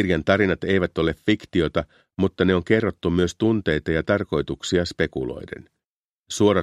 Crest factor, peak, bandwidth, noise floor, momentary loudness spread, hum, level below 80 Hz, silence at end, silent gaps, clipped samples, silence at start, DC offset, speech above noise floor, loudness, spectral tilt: 20 dB; -2 dBFS; 12.5 kHz; -89 dBFS; 10 LU; none; -44 dBFS; 0 s; 5.84-6.24 s; under 0.1%; 0 s; under 0.1%; 67 dB; -22 LUFS; -6 dB/octave